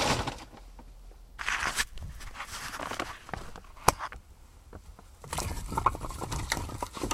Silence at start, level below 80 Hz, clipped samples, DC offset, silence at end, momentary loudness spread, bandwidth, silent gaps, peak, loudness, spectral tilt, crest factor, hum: 0 s; -44 dBFS; under 0.1%; under 0.1%; 0 s; 23 LU; 16 kHz; none; 0 dBFS; -33 LUFS; -3 dB/octave; 34 dB; none